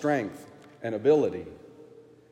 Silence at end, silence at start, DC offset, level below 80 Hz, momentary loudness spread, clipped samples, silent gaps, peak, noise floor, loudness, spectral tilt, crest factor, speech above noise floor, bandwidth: 0.3 s; 0 s; under 0.1%; -70 dBFS; 23 LU; under 0.1%; none; -10 dBFS; -52 dBFS; -27 LUFS; -7 dB/octave; 18 dB; 26 dB; 11 kHz